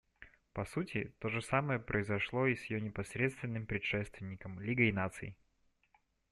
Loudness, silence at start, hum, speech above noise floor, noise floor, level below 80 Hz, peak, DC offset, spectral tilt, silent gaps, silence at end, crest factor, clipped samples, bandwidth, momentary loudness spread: -37 LUFS; 0.2 s; none; 39 dB; -75 dBFS; -62 dBFS; -16 dBFS; under 0.1%; -6.5 dB/octave; none; 1 s; 22 dB; under 0.1%; 12.5 kHz; 13 LU